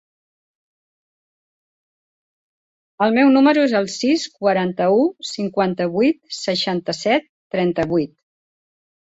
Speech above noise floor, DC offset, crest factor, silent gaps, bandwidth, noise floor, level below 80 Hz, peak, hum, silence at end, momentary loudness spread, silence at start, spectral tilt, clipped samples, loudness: over 72 dB; under 0.1%; 18 dB; 7.29-7.50 s; 8 kHz; under -90 dBFS; -60 dBFS; -4 dBFS; none; 0.95 s; 9 LU; 3 s; -5 dB/octave; under 0.1%; -19 LUFS